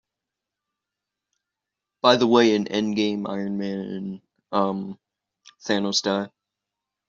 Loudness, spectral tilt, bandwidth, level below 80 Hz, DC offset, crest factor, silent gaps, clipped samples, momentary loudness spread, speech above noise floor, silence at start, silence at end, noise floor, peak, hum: -23 LUFS; -3.5 dB/octave; 7.6 kHz; -68 dBFS; under 0.1%; 22 dB; none; under 0.1%; 18 LU; 64 dB; 2.05 s; 0.8 s; -86 dBFS; -2 dBFS; none